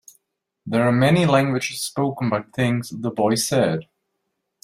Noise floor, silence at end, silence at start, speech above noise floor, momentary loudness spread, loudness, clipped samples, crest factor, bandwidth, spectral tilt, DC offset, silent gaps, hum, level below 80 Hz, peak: -76 dBFS; 0.8 s; 0.65 s; 56 dB; 9 LU; -21 LUFS; under 0.1%; 18 dB; 16 kHz; -5.5 dB/octave; under 0.1%; none; none; -58 dBFS; -4 dBFS